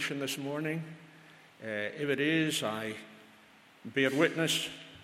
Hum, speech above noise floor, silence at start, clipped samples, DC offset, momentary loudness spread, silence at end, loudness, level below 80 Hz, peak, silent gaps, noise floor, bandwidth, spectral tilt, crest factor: none; 27 dB; 0 s; under 0.1%; under 0.1%; 18 LU; 0 s; -32 LUFS; -78 dBFS; -14 dBFS; none; -59 dBFS; 16 kHz; -4 dB/octave; 20 dB